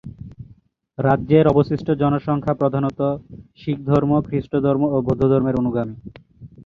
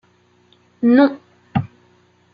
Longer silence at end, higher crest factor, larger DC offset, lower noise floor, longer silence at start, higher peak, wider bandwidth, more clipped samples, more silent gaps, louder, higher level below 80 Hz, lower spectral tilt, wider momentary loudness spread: second, 0.05 s vs 0.65 s; about the same, 18 dB vs 18 dB; neither; second, -52 dBFS vs -56 dBFS; second, 0.05 s vs 0.8 s; about the same, -2 dBFS vs -2 dBFS; first, 6 kHz vs 5.2 kHz; neither; neither; about the same, -19 LUFS vs -17 LUFS; first, -44 dBFS vs -60 dBFS; about the same, -10 dB/octave vs -9.5 dB/octave; second, 15 LU vs 22 LU